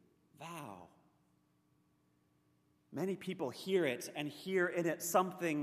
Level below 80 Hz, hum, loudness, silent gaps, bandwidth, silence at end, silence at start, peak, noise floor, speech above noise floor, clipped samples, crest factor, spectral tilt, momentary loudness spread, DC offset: -86 dBFS; none; -37 LUFS; none; 15 kHz; 0 s; 0.4 s; -16 dBFS; -75 dBFS; 39 dB; under 0.1%; 22 dB; -4.5 dB/octave; 16 LU; under 0.1%